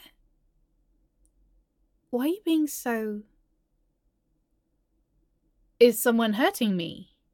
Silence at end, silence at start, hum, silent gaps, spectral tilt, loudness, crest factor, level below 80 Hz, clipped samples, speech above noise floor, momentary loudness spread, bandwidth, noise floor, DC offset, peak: 0.3 s; 2.1 s; none; none; -4.5 dB/octave; -25 LUFS; 24 dB; -68 dBFS; under 0.1%; 48 dB; 15 LU; 17.5 kHz; -73 dBFS; under 0.1%; -6 dBFS